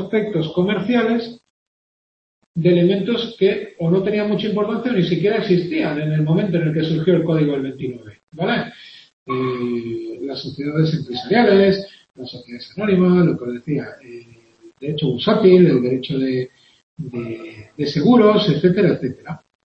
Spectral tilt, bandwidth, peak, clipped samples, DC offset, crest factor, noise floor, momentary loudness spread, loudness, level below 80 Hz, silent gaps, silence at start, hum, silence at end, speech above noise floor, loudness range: -8.5 dB/octave; 6.4 kHz; -2 dBFS; under 0.1%; under 0.1%; 18 dB; -48 dBFS; 18 LU; -18 LUFS; -56 dBFS; 1.50-2.54 s, 8.23-8.27 s, 9.13-9.26 s, 16.83-16.97 s; 0 s; none; 0.25 s; 30 dB; 4 LU